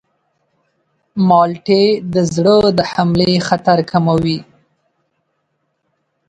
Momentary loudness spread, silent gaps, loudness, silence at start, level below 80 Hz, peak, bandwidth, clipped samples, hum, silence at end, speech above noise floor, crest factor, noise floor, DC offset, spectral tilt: 6 LU; none; -14 LUFS; 1.15 s; -48 dBFS; 0 dBFS; 9.2 kHz; under 0.1%; none; 1.85 s; 55 dB; 16 dB; -68 dBFS; under 0.1%; -6.5 dB/octave